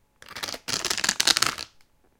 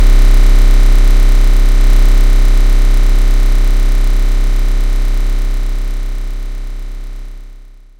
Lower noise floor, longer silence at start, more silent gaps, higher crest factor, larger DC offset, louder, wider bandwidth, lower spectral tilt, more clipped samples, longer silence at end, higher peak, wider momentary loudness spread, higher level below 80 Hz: first, -59 dBFS vs -34 dBFS; first, 0.3 s vs 0 s; neither; first, 28 dB vs 8 dB; neither; second, -24 LUFS vs -15 LUFS; first, 17 kHz vs 9.2 kHz; second, 0.5 dB/octave vs -5.5 dB/octave; neither; about the same, 0.5 s vs 0.45 s; about the same, 0 dBFS vs 0 dBFS; first, 19 LU vs 15 LU; second, -58 dBFS vs -8 dBFS